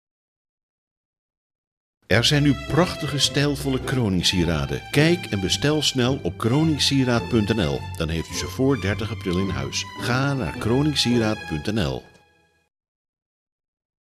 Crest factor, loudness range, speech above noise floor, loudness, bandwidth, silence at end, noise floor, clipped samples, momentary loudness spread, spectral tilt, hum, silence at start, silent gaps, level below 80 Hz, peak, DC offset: 20 dB; 4 LU; 39 dB; -22 LUFS; 15.5 kHz; 2 s; -61 dBFS; under 0.1%; 7 LU; -5 dB/octave; none; 2.1 s; none; -44 dBFS; -4 dBFS; under 0.1%